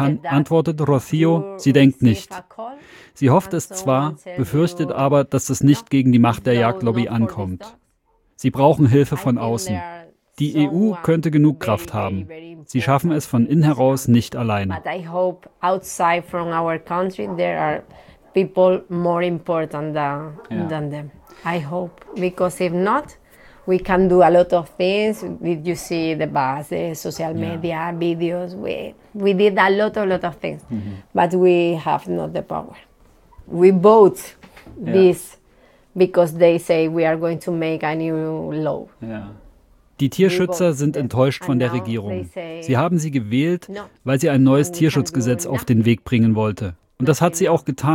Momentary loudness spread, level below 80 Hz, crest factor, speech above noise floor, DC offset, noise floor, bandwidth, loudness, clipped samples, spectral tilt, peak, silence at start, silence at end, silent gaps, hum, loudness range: 14 LU; -50 dBFS; 18 dB; 44 dB; under 0.1%; -62 dBFS; 17 kHz; -19 LUFS; under 0.1%; -6.5 dB/octave; -2 dBFS; 0 s; 0 s; none; none; 5 LU